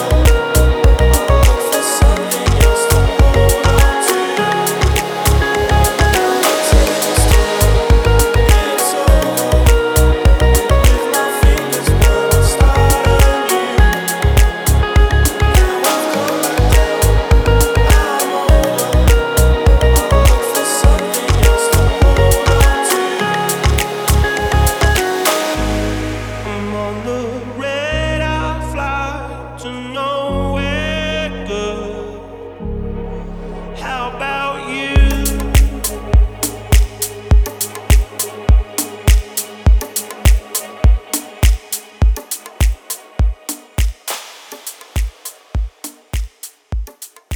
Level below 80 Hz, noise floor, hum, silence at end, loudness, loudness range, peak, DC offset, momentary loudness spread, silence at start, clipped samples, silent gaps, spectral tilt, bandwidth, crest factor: -16 dBFS; -33 dBFS; none; 0 s; -14 LUFS; 8 LU; -2 dBFS; under 0.1%; 13 LU; 0 s; under 0.1%; none; -4.5 dB/octave; over 20 kHz; 12 dB